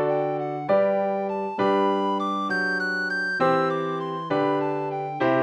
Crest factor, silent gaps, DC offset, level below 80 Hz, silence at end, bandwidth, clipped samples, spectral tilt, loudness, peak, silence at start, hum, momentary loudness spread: 14 dB; none; under 0.1%; -74 dBFS; 0 s; 10 kHz; under 0.1%; -6.5 dB/octave; -24 LUFS; -10 dBFS; 0 s; none; 7 LU